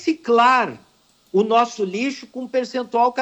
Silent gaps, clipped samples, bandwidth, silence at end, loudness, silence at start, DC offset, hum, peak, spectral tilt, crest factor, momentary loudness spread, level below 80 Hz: none; under 0.1%; 19 kHz; 0 s; -19 LUFS; 0 s; under 0.1%; none; -6 dBFS; -4.5 dB/octave; 14 dB; 10 LU; -70 dBFS